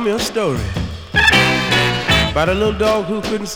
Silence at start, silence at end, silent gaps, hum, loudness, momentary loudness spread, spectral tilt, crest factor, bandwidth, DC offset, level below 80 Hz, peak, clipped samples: 0 s; 0 s; none; none; -15 LUFS; 10 LU; -4 dB/octave; 16 dB; over 20 kHz; under 0.1%; -30 dBFS; 0 dBFS; under 0.1%